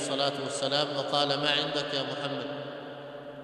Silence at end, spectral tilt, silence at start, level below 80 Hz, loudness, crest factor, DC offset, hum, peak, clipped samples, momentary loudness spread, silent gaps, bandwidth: 0 s; -3.5 dB/octave; 0 s; -78 dBFS; -29 LUFS; 22 dB; under 0.1%; none; -10 dBFS; under 0.1%; 15 LU; none; 12 kHz